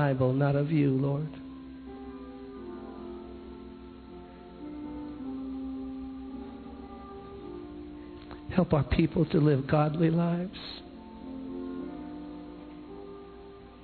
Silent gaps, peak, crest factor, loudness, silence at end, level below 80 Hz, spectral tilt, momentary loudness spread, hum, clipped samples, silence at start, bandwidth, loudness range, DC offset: none; -10 dBFS; 22 dB; -30 LUFS; 0 s; -50 dBFS; -11.5 dB/octave; 20 LU; none; under 0.1%; 0 s; 4.6 kHz; 15 LU; under 0.1%